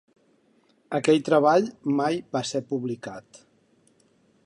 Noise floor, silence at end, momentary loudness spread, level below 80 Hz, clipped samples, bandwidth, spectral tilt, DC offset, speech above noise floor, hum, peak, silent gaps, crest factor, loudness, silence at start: -64 dBFS; 1.25 s; 15 LU; -74 dBFS; under 0.1%; 11.5 kHz; -5.5 dB/octave; under 0.1%; 40 dB; none; -8 dBFS; none; 20 dB; -24 LUFS; 0.9 s